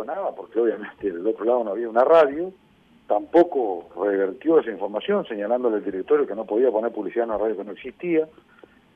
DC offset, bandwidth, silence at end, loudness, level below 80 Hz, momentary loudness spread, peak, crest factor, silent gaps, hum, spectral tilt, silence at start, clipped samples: under 0.1%; 5.4 kHz; 0.7 s; -23 LUFS; -64 dBFS; 11 LU; -6 dBFS; 16 dB; none; none; -8 dB/octave; 0 s; under 0.1%